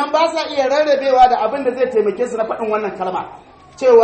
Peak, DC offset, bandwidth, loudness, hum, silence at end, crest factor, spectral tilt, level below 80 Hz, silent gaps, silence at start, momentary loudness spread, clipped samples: 0 dBFS; under 0.1%; 8.8 kHz; -16 LUFS; none; 0 s; 16 dB; -4 dB/octave; -50 dBFS; none; 0 s; 10 LU; under 0.1%